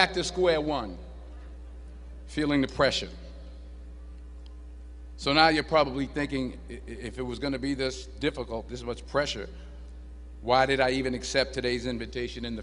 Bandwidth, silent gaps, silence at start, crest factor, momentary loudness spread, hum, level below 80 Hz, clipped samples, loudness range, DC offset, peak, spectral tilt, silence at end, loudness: 10.5 kHz; none; 0 s; 24 dB; 22 LU; none; -42 dBFS; under 0.1%; 5 LU; under 0.1%; -4 dBFS; -4.5 dB/octave; 0 s; -28 LUFS